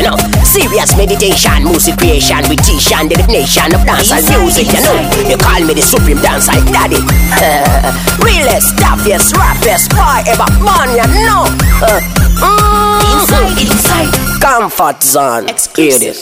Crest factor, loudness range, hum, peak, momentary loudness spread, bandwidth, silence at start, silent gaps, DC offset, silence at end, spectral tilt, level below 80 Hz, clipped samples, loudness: 8 dB; 1 LU; none; 0 dBFS; 2 LU; 16.5 kHz; 0 s; none; under 0.1%; 0 s; -3.5 dB/octave; -14 dBFS; 0.4%; -8 LUFS